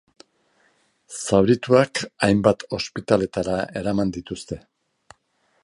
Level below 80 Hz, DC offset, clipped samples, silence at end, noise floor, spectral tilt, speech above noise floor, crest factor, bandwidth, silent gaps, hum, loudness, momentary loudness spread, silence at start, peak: -50 dBFS; under 0.1%; under 0.1%; 1.05 s; -67 dBFS; -5.5 dB/octave; 46 dB; 22 dB; 11.5 kHz; none; none; -22 LUFS; 15 LU; 1.1 s; -2 dBFS